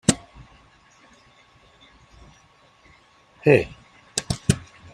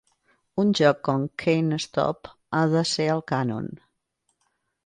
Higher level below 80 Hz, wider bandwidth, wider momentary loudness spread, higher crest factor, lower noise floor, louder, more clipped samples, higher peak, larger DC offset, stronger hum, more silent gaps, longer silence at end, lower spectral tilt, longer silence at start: first, -48 dBFS vs -62 dBFS; first, 13.5 kHz vs 10.5 kHz; about the same, 12 LU vs 11 LU; first, 26 dB vs 20 dB; second, -56 dBFS vs -75 dBFS; about the same, -23 LUFS vs -24 LUFS; neither; first, 0 dBFS vs -6 dBFS; neither; neither; neither; second, 0.35 s vs 1.1 s; about the same, -4.5 dB/octave vs -5.5 dB/octave; second, 0.1 s vs 0.55 s